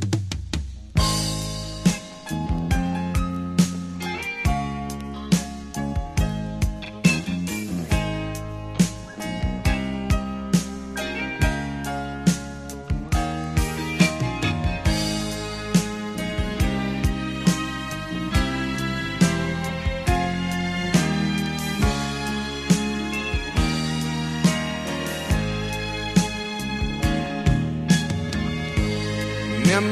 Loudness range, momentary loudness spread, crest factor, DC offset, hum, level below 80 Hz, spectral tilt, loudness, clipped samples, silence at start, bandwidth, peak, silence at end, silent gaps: 2 LU; 8 LU; 20 dB; under 0.1%; none; -32 dBFS; -5 dB/octave; -24 LUFS; under 0.1%; 0 s; 13 kHz; -4 dBFS; 0 s; none